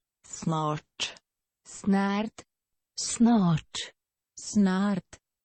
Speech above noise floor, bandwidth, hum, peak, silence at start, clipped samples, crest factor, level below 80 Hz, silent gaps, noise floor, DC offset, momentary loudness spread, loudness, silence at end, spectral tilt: 56 dB; 8.8 kHz; none; -14 dBFS; 0.3 s; under 0.1%; 16 dB; -62 dBFS; none; -82 dBFS; under 0.1%; 17 LU; -28 LUFS; 0.45 s; -5 dB/octave